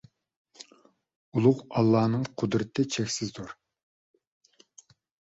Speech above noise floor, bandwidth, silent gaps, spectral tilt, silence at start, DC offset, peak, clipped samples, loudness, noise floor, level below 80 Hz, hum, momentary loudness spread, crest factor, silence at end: 36 dB; 8 kHz; 1.16-1.32 s; -6 dB/octave; 0.6 s; under 0.1%; -8 dBFS; under 0.1%; -27 LUFS; -62 dBFS; -64 dBFS; none; 22 LU; 22 dB; 1.85 s